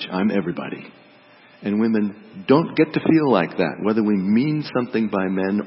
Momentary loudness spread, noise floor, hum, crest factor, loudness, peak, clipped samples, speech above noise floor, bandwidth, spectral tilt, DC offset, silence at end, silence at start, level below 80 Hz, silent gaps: 11 LU; -50 dBFS; none; 18 dB; -20 LUFS; -2 dBFS; under 0.1%; 30 dB; 5.8 kHz; -11.5 dB/octave; under 0.1%; 0 s; 0 s; -64 dBFS; none